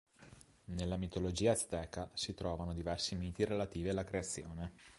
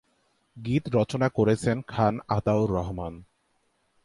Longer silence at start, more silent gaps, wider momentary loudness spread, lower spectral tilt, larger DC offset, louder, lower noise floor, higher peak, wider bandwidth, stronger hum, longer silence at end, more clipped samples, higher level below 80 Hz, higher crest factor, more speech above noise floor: second, 0.2 s vs 0.55 s; neither; about the same, 10 LU vs 11 LU; second, -4.5 dB/octave vs -7.5 dB/octave; neither; second, -39 LUFS vs -26 LUFS; second, -61 dBFS vs -71 dBFS; second, -18 dBFS vs -10 dBFS; about the same, 11.5 kHz vs 11.5 kHz; neither; second, 0 s vs 0.8 s; neither; about the same, -52 dBFS vs -48 dBFS; about the same, 20 dB vs 18 dB; second, 22 dB vs 46 dB